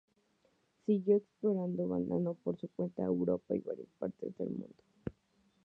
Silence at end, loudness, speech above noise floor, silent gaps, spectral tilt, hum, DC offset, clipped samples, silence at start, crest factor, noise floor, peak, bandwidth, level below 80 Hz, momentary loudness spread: 0.55 s; -36 LUFS; 39 dB; none; -11.5 dB/octave; none; under 0.1%; under 0.1%; 0.9 s; 18 dB; -74 dBFS; -18 dBFS; 4.1 kHz; -68 dBFS; 15 LU